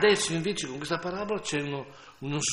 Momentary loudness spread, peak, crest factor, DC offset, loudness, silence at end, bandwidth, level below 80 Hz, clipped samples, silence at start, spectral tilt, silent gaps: 12 LU; -10 dBFS; 18 dB; under 0.1%; -30 LUFS; 0 s; 12 kHz; -60 dBFS; under 0.1%; 0 s; -3.5 dB/octave; none